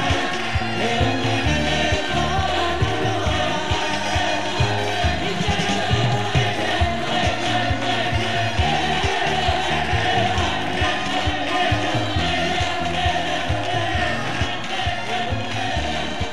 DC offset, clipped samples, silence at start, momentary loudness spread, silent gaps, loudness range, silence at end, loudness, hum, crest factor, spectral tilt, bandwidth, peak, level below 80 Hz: 3%; under 0.1%; 0 s; 3 LU; none; 2 LU; 0 s; -21 LUFS; none; 16 dB; -4.5 dB/octave; 13 kHz; -6 dBFS; -34 dBFS